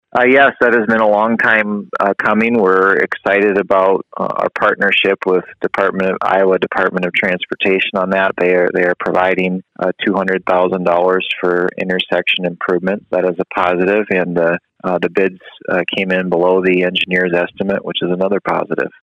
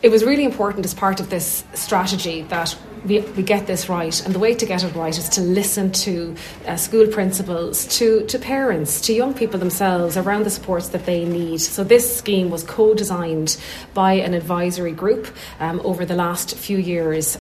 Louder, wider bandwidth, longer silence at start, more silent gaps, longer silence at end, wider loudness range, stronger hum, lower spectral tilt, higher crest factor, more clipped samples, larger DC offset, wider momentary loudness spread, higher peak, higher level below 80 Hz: first, -14 LUFS vs -19 LUFS; second, 8.4 kHz vs 14 kHz; first, 0.15 s vs 0 s; neither; first, 0.15 s vs 0 s; about the same, 3 LU vs 3 LU; neither; first, -7 dB/octave vs -4 dB/octave; about the same, 14 dB vs 18 dB; neither; neither; about the same, 6 LU vs 7 LU; about the same, 0 dBFS vs 0 dBFS; second, -56 dBFS vs -48 dBFS